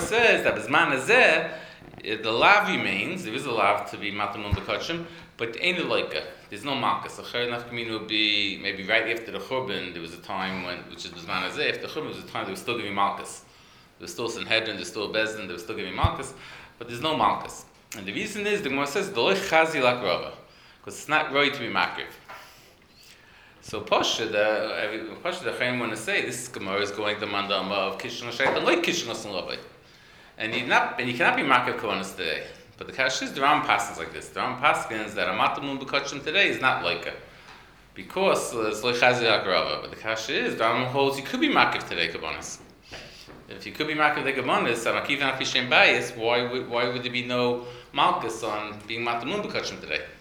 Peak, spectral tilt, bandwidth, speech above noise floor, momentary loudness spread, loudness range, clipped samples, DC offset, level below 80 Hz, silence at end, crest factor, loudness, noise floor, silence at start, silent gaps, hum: -2 dBFS; -3.5 dB/octave; over 20 kHz; 28 dB; 16 LU; 6 LU; under 0.1%; under 0.1%; -54 dBFS; 0 s; 26 dB; -25 LUFS; -53 dBFS; 0 s; none; none